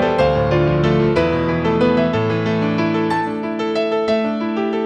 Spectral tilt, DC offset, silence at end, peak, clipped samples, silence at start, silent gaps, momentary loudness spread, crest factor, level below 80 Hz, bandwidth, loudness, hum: -8 dB/octave; under 0.1%; 0 s; -2 dBFS; under 0.1%; 0 s; none; 5 LU; 14 dB; -38 dBFS; 9 kHz; -18 LUFS; none